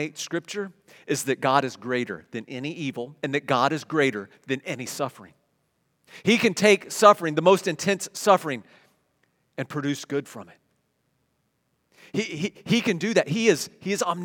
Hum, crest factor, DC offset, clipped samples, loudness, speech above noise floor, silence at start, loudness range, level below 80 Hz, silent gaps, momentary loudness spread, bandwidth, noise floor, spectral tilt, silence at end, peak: none; 24 dB; under 0.1%; under 0.1%; -24 LUFS; 48 dB; 0 s; 12 LU; -74 dBFS; none; 14 LU; 18 kHz; -72 dBFS; -4.5 dB/octave; 0 s; 0 dBFS